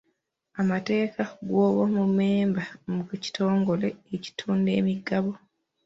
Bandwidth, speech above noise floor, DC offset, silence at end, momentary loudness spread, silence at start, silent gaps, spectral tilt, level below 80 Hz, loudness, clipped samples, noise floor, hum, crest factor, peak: 7.8 kHz; 50 dB; under 0.1%; 0.5 s; 10 LU; 0.55 s; none; -7.5 dB/octave; -66 dBFS; -26 LUFS; under 0.1%; -75 dBFS; none; 14 dB; -12 dBFS